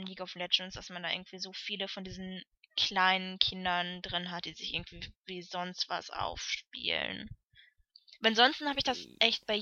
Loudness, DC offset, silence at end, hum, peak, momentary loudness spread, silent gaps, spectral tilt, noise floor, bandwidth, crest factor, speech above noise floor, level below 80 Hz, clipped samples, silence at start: -32 LUFS; under 0.1%; 0 s; none; -6 dBFS; 16 LU; 5.16-5.21 s; -3 dB/octave; -64 dBFS; 7.8 kHz; 28 dB; 30 dB; -62 dBFS; under 0.1%; 0 s